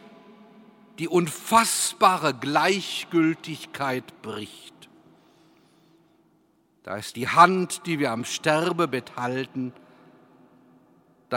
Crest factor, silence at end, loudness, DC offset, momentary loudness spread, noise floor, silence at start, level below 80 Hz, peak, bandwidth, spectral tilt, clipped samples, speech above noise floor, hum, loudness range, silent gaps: 26 dB; 0 s; -23 LUFS; under 0.1%; 17 LU; -64 dBFS; 1 s; -72 dBFS; 0 dBFS; 16.5 kHz; -3.5 dB/octave; under 0.1%; 40 dB; none; 13 LU; none